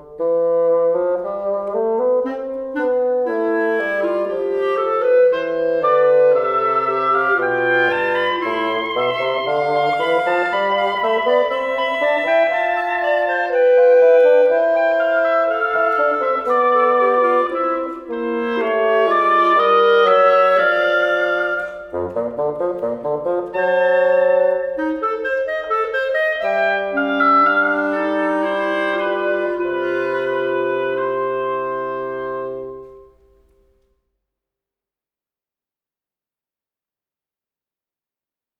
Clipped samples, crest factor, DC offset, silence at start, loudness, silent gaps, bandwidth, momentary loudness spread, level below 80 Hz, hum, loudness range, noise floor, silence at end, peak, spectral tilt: under 0.1%; 16 dB; under 0.1%; 0 s; -17 LUFS; none; 6.2 kHz; 9 LU; -58 dBFS; none; 6 LU; under -90 dBFS; 5.55 s; -2 dBFS; -5.5 dB/octave